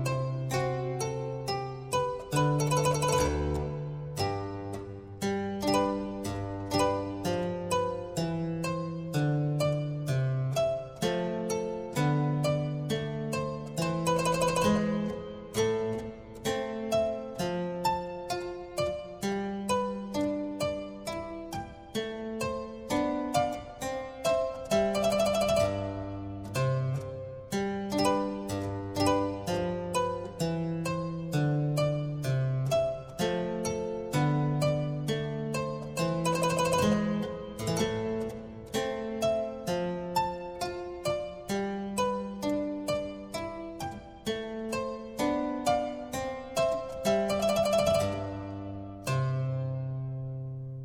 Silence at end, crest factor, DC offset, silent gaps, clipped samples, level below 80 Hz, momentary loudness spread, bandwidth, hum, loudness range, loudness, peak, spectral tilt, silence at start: 0 s; 18 dB; under 0.1%; none; under 0.1%; -52 dBFS; 10 LU; 16.5 kHz; none; 4 LU; -31 LUFS; -12 dBFS; -5.5 dB/octave; 0 s